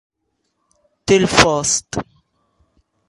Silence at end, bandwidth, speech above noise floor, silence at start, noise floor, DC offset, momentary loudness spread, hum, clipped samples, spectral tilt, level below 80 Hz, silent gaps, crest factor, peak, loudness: 1.05 s; 14 kHz; 56 dB; 1.05 s; -71 dBFS; under 0.1%; 15 LU; none; under 0.1%; -3 dB/octave; -42 dBFS; none; 20 dB; 0 dBFS; -15 LUFS